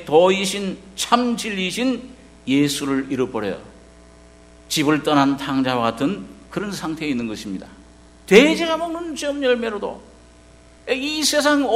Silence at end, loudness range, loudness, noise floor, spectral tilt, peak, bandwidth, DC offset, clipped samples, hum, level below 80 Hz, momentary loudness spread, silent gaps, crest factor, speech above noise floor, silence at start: 0 s; 3 LU; -20 LUFS; -47 dBFS; -4 dB/octave; 0 dBFS; 16 kHz; under 0.1%; under 0.1%; none; -50 dBFS; 14 LU; none; 20 dB; 28 dB; 0 s